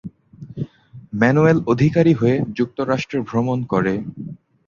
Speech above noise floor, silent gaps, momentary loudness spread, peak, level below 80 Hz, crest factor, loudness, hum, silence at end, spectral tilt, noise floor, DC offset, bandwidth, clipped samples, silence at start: 23 dB; none; 17 LU; -2 dBFS; -50 dBFS; 18 dB; -18 LUFS; none; 0.3 s; -8 dB/octave; -41 dBFS; under 0.1%; 7.2 kHz; under 0.1%; 0.05 s